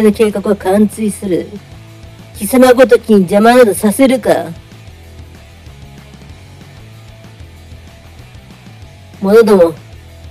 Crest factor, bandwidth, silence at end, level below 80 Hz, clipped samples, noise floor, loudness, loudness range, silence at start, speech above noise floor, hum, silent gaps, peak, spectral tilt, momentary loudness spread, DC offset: 12 dB; 16 kHz; 0 s; -40 dBFS; 0.5%; -35 dBFS; -10 LUFS; 8 LU; 0 s; 26 dB; none; none; 0 dBFS; -5.5 dB/octave; 20 LU; under 0.1%